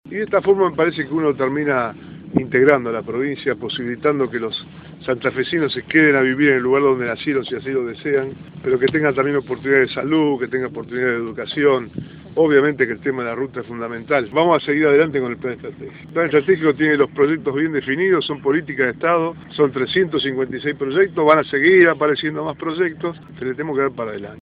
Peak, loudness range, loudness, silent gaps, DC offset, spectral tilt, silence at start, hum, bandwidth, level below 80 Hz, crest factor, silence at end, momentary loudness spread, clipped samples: 0 dBFS; 3 LU; -18 LUFS; none; under 0.1%; -9 dB/octave; 0.05 s; none; 5 kHz; -56 dBFS; 18 dB; 0 s; 12 LU; under 0.1%